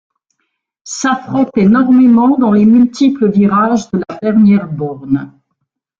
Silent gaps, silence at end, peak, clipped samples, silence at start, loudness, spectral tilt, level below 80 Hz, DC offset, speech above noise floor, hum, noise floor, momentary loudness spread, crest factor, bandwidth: none; 0.7 s; -2 dBFS; under 0.1%; 0.85 s; -11 LUFS; -6.5 dB/octave; -50 dBFS; under 0.1%; 60 dB; none; -70 dBFS; 10 LU; 10 dB; 7.6 kHz